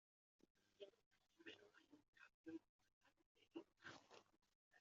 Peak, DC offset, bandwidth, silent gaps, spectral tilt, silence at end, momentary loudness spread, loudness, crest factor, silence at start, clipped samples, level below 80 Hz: -44 dBFS; under 0.1%; 7.4 kHz; 1.06-1.11 s, 2.08-2.13 s, 2.34-2.44 s, 2.69-2.79 s, 2.93-3.01 s, 3.26-3.35 s, 4.55-4.71 s; -2.5 dB/octave; 0 s; 6 LU; -63 LUFS; 22 dB; 0.55 s; under 0.1%; under -90 dBFS